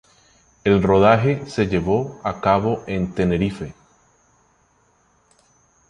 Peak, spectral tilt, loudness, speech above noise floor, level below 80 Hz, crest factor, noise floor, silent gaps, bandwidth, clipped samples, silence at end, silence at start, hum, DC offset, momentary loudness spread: -2 dBFS; -7.5 dB/octave; -19 LUFS; 42 dB; -42 dBFS; 20 dB; -60 dBFS; none; 10 kHz; under 0.1%; 2.15 s; 0.65 s; none; under 0.1%; 11 LU